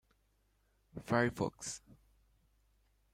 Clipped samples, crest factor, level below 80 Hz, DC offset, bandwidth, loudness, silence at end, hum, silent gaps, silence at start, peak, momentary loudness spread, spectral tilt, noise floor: under 0.1%; 24 dB; -68 dBFS; under 0.1%; 16 kHz; -36 LUFS; 1.35 s; none; none; 0.95 s; -18 dBFS; 18 LU; -5 dB/octave; -75 dBFS